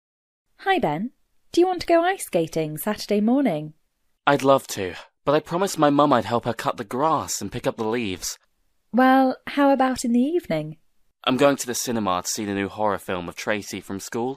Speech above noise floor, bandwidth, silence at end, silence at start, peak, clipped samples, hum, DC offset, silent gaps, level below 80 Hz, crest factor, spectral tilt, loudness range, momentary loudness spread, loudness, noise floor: 44 dB; 15.5 kHz; 0 s; 0.6 s; -2 dBFS; under 0.1%; none; under 0.1%; none; -56 dBFS; 20 dB; -4.5 dB/octave; 3 LU; 11 LU; -23 LUFS; -66 dBFS